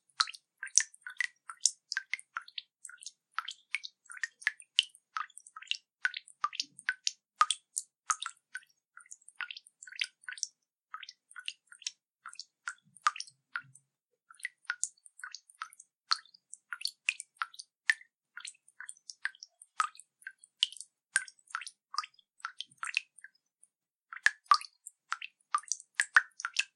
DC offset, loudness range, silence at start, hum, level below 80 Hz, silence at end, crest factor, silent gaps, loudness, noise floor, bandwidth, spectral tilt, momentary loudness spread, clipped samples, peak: under 0.1%; 7 LU; 0.2 s; none; under -90 dBFS; 0.1 s; 36 dB; 12.10-12.15 s, 15.96-16.01 s, 18.14-18.18 s, 23.95-23.99 s; -35 LUFS; -82 dBFS; 14 kHz; 5.5 dB/octave; 19 LU; under 0.1%; -2 dBFS